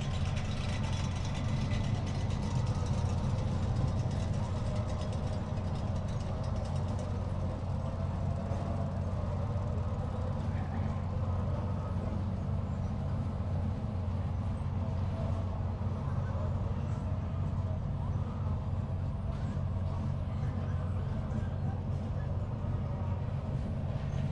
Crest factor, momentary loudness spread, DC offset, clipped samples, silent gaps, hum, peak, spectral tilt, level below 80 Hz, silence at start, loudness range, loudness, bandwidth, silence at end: 14 dB; 3 LU; under 0.1%; under 0.1%; none; none; -20 dBFS; -7.5 dB/octave; -42 dBFS; 0 s; 2 LU; -35 LUFS; 9.6 kHz; 0 s